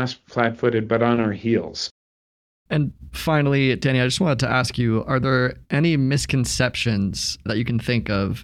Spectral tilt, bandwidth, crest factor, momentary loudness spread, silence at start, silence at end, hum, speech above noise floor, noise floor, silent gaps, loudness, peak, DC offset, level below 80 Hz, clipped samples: -5.5 dB/octave; 15.5 kHz; 18 dB; 6 LU; 0 s; 0 s; none; over 69 dB; under -90 dBFS; 1.91-2.65 s; -21 LUFS; -4 dBFS; under 0.1%; -44 dBFS; under 0.1%